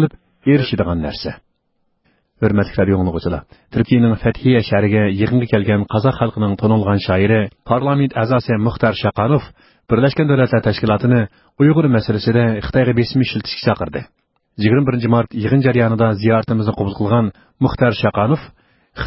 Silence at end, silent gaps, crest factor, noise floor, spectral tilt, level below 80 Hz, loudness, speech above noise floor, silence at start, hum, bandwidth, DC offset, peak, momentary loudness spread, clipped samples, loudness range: 0 s; none; 16 dB; -66 dBFS; -12 dB/octave; -38 dBFS; -16 LUFS; 51 dB; 0 s; none; 5.8 kHz; under 0.1%; 0 dBFS; 6 LU; under 0.1%; 2 LU